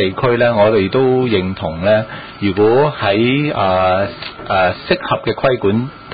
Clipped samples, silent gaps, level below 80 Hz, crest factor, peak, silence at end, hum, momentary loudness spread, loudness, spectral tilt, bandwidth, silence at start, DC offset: under 0.1%; none; -40 dBFS; 14 dB; 0 dBFS; 0 s; none; 7 LU; -15 LUFS; -12 dB/octave; 5 kHz; 0 s; 0.4%